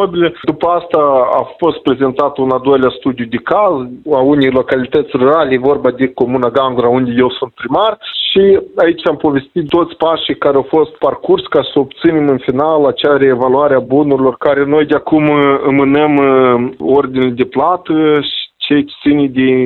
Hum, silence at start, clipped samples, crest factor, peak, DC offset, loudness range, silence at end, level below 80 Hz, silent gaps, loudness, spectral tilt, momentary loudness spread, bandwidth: none; 0 s; under 0.1%; 12 dB; 0 dBFS; under 0.1%; 2 LU; 0 s; -46 dBFS; none; -12 LUFS; -8.5 dB/octave; 5 LU; 4.3 kHz